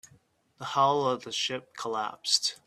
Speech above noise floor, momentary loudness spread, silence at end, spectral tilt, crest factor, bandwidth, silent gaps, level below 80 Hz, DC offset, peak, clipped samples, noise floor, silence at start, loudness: 34 dB; 10 LU; 0.1 s; -2 dB/octave; 22 dB; 14 kHz; none; -76 dBFS; under 0.1%; -8 dBFS; under 0.1%; -63 dBFS; 0.6 s; -28 LUFS